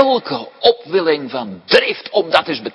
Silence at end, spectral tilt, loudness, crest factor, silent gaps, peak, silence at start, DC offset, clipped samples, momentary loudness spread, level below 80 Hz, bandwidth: 0.05 s; -4.5 dB/octave; -16 LUFS; 16 dB; none; 0 dBFS; 0 s; under 0.1%; 0.1%; 10 LU; -60 dBFS; 11 kHz